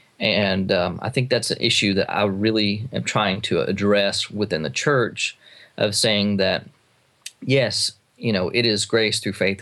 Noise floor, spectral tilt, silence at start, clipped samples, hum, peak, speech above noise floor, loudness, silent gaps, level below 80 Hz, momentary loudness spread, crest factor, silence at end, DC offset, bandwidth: -61 dBFS; -4 dB/octave; 0.2 s; under 0.1%; none; -4 dBFS; 40 dB; -21 LUFS; none; -60 dBFS; 7 LU; 16 dB; 0 s; under 0.1%; 12.5 kHz